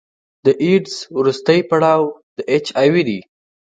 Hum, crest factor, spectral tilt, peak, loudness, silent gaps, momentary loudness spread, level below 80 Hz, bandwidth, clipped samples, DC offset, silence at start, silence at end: none; 16 dB; -6 dB/octave; 0 dBFS; -16 LUFS; 2.23-2.36 s; 9 LU; -64 dBFS; 9.2 kHz; under 0.1%; under 0.1%; 0.45 s; 0.55 s